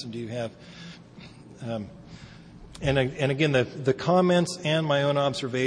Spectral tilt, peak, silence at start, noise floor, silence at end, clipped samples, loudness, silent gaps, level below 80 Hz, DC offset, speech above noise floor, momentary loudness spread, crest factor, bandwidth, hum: -6 dB/octave; -10 dBFS; 0 s; -47 dBFS; 0 s; under 0.1%; -25 LUFS; none; -52 dBFS; under 0.1%; 21 dB; 23 LU; 18 dB; 10.5 kHz; none